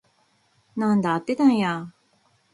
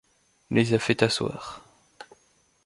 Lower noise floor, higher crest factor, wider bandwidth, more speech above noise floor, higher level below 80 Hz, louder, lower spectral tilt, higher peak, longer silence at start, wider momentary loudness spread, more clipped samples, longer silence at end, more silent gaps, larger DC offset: about the same, -65 dBFS vs -65 dBFS; about the same, 18 dB vs 22 dB; about the same, 11.5 kHz vs 11.5 kHz; about the same, 43 dB vs 40 dB; second, -68 dBFS vs -58 dBFS; about the same, -22 LUFS vs -24 LUFS; first, -7 dB/octave vs -5 dB/octave; about the same, -8 dBFS vs -6 dBFS; first, 0.75 s vs 0.5 s; second, 15 LU vs 18 LU; neither; about the same, 0.65 s vs 0.6 s; neither; neither